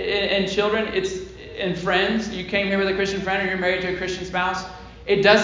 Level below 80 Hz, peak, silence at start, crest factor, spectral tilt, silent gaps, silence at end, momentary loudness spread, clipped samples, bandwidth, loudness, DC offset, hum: -46 dBFS; -2 dBFS; 0 s; 20 dB; -4.5 dB/octave; none; 0 s; 9 LU; under 0.1%; 7.6 kHz; -22 LUFS; under 0.1%; none